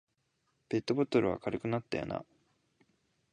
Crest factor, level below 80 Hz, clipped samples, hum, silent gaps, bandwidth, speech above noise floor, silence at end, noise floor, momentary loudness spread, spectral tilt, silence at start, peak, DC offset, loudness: 20 dB; -64 dBFS; under 0.1%; none; none; 10.5 kHz; 46 dB; 1.1 s; -78 dBFS; 8 LU; -7 dB/octave; 0.7 s; -16 dBFS; under 0.1%; -34 LUFS